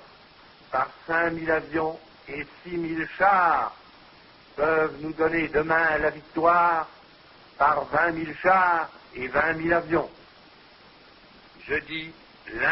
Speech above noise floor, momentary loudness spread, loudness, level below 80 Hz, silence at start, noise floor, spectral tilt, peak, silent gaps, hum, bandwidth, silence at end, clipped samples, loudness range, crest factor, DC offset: 28 dB; 16 LU; -24 LUFS; -54 dBFS; 0.7 s; -52 dBFS; -9.5 dB/octave; -6 dBFS; none; none; 5.8 kHz; 0 s; under 0.1%; 5 LU; 20 dB; under 0.1%